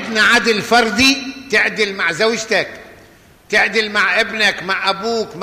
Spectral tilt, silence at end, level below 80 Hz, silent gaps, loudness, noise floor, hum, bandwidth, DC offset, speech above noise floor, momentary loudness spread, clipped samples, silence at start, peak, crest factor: -2.5 dB/octave; 0 s; -50 dBFS; none; -14 LUFS; -46 dBFS; none; 15 kHz; under 0.1%; 30 dB; 7 LU; under 0.1%; 0 s; -2 dBFS; 14 dB